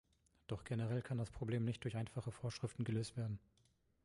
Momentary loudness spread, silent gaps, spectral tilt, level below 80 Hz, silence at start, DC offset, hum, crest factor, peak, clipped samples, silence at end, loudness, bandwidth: 8 LU; none; -7 dB/octave; -66 dBFS; 0.5 s; under 0.1%; none; 14 dB; -28 dBFS; under 0.1%; 0.65 s; -44 LUFS; 11.5 kHz